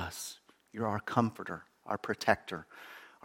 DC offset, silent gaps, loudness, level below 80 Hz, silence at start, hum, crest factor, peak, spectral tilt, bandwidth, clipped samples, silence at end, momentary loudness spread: under 0.1%; none; -35 LUFS; -66 dBFS; 0 s; none; 26 dB; -10 dBFS; -5 dB/octave; 17 kHz; under 0.1%; 0.15 s; 19 LU